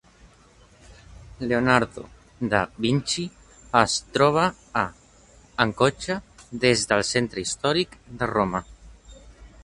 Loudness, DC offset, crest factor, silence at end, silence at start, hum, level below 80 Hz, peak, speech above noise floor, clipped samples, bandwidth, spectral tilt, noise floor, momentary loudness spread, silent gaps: -24 LUFS; under 0.1%; 24 dB; 0.15 s; 0.9 s; none; -50 dBFS; 0 dBFS; 31 dB; under 0.1%; 11.5 kHz; -4 dB/octave; -54 dBFS; 12 LU; none